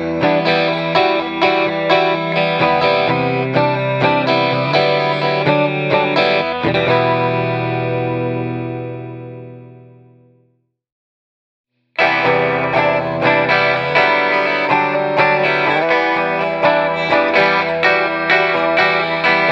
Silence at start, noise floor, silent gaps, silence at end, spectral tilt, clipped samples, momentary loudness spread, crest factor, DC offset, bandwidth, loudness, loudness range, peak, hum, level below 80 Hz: 0 s; -62 dBFS; 10.92-11.64 s; 0 s; -6.5 dB/octave; under 0.1%; 6 LU; 16 dB; under 0.1%; 8 kHz; -15 LUFS; 9 LU; 0 dBFS; none; -54 dBFS